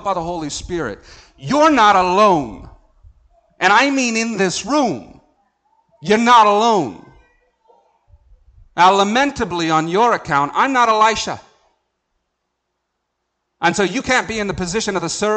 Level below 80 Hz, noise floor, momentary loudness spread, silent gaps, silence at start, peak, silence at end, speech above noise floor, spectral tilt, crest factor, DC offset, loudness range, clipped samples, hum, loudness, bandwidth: -46 dBFS; -74 dBFS; 14 LU; none; 0 s; -2 dBFS; 0 s; 58 dB; -3.5 dB/octave; 16 dB; under 0.1%; 6 LU; under 0.1%; none; -15 LUFS; 9.2 kHz